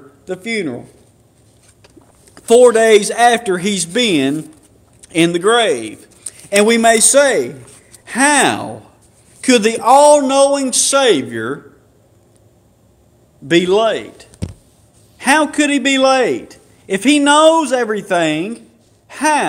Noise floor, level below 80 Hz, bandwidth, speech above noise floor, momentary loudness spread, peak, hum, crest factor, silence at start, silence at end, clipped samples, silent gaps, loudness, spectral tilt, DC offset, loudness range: -51 dBFS; -54 dBFS; over 20 kHz; 39 dB; 18 LU; 0 dBFS; none; 14 dB; 0.3 s; 0 s; 0.1%; none; -13 LUFS; -3 dB/octave; under 0.1%; 5 LU